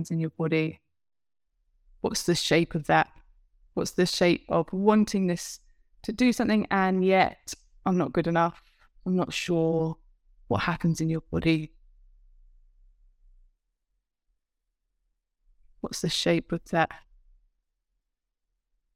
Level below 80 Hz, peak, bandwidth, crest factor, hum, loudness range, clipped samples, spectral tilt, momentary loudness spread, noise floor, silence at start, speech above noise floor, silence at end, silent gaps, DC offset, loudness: -54 dBFS; -8 dBFS; 16 kHz; 20 dB; none; 7 LU; under 0.1%; -5.5 dB/octave; 13 LU; -84 dBFS; 0 s; 59 dB; 1.95 s; none; under 0.1%; -26 LUFS